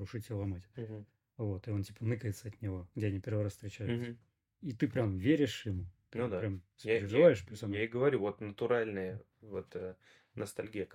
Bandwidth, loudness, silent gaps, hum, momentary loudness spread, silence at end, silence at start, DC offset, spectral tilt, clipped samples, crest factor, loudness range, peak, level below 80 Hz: 16 kHz; -36 LUFS; none; none; 15 LU; 0 s; 0 s; under 0.1%; -7 dB/octave; under 0.1%; 22 dB; 7 LU; -12 dBFS; -70 dBFS